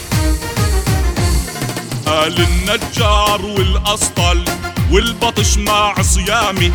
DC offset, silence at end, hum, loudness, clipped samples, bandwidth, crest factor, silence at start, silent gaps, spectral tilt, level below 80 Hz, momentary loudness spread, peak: under 0.1%; 0 s; none; -15 LUFS; under 0.1%; over 20 kHz; 14 dB; 0 s; none; -4 dB/octave; -20 dBFS; 5 LU; 0 dBFS